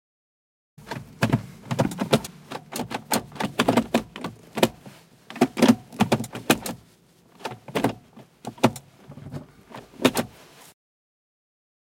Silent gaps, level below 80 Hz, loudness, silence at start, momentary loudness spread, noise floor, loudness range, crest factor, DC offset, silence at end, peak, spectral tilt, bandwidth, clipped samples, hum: none; -56 dBFS; -25 LUFS; 0.8 s; 20 LU; -57 dBFS; 5 LU; 24 dB; under 0.1%; 1.6 s; -2 dBFS; -5 dB/octave; 17 kHz; under 0.1%; none